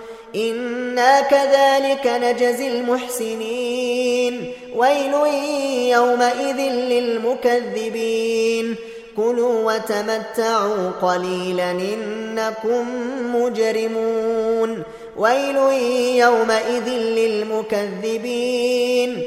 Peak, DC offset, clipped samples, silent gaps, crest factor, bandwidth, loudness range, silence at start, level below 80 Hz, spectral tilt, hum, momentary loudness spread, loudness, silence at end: -2 dBFS; under 0.1%; under 0.1%; none; 16 dB; 15.5 kHz; 4 LU; 0 s; -62 dBFS; -3.5 dB/octave; none; 9 LU; -19 LUFS; 0 s